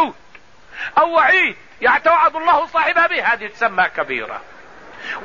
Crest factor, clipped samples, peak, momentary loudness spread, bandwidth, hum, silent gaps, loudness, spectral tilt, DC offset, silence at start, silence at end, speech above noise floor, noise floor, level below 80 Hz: 14 dB; under 0.1%; -4 dBFS; 15 LU; 7.4 kHz; none; none; -16 LUFS; -4 dB/octave; 0.5%; 0 s; 0 s; 30 dB; -47 dBFS; -56 dBFS